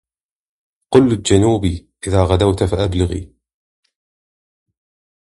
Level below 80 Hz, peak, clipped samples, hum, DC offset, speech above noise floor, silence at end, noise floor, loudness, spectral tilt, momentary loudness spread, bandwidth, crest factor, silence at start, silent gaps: -32 dBFS; 0 dBFS; under 0.1%; none; under 0.1%; over 75 dB; 2.1 s; under -90 dBFS; -16 LUFS; -6.5 dB/octave; 9 LU; 11.5 kHz; 18 dB; 0.9 s; none